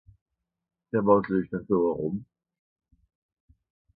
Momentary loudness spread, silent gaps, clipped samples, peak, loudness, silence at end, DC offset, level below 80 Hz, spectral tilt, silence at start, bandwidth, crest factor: 10 LU; none; under 0.1%; -6 dBFS; -26 LUFS; 1.75 s; under 0.1%; -60 dBFS; -12.5 dB/octave; 0.95 s; 4.8 kHz; 22 dB